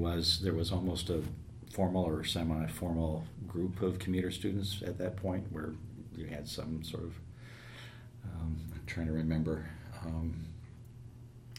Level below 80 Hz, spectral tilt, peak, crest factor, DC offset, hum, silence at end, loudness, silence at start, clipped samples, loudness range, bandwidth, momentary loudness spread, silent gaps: -52 dBFS; -6 dB/octave; -18 dBFS; 18 dB; under 0.1%; none; 0 s; -36 LUFS; 0 s; under 0.1%; 7 LU; 16 kHz; 17 LU; none